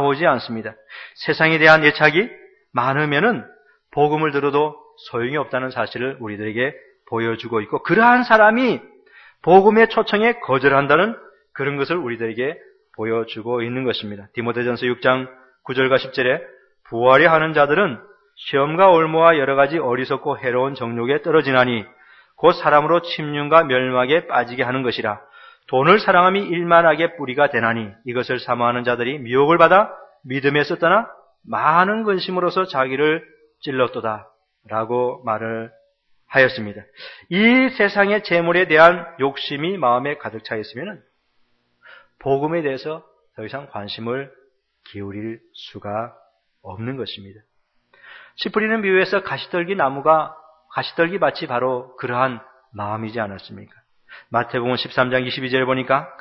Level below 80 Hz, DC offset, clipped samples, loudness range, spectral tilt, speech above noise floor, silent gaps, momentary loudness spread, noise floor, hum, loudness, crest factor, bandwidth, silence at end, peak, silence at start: -60 dBFS; under 0.1%; under 0.1%; 10 LU; -7.5 dB/octave; 45 dB; none; 17 LU; -63 dBFS; none; -18 LUFS; 20 dB; 6.4 kHz; 0.05 s; 0 dBFS; 0 s